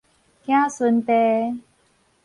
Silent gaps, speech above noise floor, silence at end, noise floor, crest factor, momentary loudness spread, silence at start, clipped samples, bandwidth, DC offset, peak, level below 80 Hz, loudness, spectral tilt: none; 43 dB; 0.65 s; -62 dBFS; 16 dB; 14 LU; 0.5 s; under 0.1%; 11 kHz; under 0.1%; -6 dBFS; -68 dBFS; -20 LUFS; -5.5 dB/octave